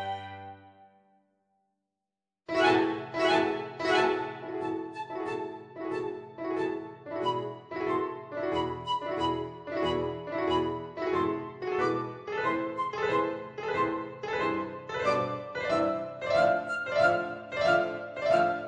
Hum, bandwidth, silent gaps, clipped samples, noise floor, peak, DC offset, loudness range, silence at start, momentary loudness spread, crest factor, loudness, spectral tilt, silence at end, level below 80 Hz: none; 9.8 kHz; none; under 0.1%; -90 dBFS; -10 dBFS; under 0.1%; 5 LU; 0 s; 11 LU; 22 dB; -30 LUFS; -5.5 dB/octave; 0 s; -62 dBFS